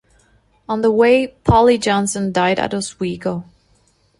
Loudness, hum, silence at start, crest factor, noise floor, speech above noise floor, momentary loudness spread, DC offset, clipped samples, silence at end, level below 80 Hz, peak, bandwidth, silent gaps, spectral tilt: -17 LUFS; none; 0.7 s; 16 dB; -58 dBFS; 42 dB; 12 LU; under 0.1%; under 0.1%; 0.8 s; -38 dBFS; -2 dBFS; 11.5 kHz; none; -5 dB/octave